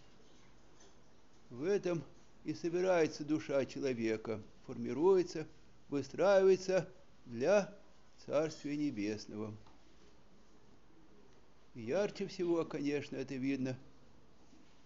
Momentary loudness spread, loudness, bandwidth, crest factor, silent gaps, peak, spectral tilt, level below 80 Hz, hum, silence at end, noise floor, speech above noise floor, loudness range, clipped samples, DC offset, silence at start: 18 LU; -36 LUFS; 7.6 kHz; 20 dB; none; -18 dBFS; -5.5 dB/octave; -70 dBFS; none; 1.05 s; -66 dBFS; 31 dB; 8 LU; under 0.1%; 0.1%; 1.5 s